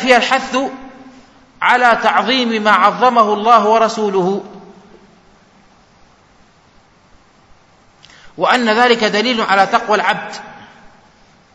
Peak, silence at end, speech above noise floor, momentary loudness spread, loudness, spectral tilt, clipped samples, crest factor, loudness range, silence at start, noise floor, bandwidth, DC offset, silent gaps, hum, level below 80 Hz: 0 dBFS; 0.9 s; 36 dB; 11 LU; -13 LUFS; -3.5 dB/octave; 0.2%; 16 dB; 10 LU; 0 s; -49 dBFS; 11 kHz; under 0.1%; none; none; -56 dBFS